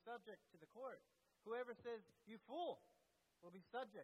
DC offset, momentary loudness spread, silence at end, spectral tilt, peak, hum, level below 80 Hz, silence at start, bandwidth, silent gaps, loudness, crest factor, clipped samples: under 0.1%; 14 LU; 0 s; -5.5 dB/octave; -38 dBFS; none; under -90 dBFS; 0.05 s; 12 kHz; none; -54 LUFS; 16 dB; under 0.1%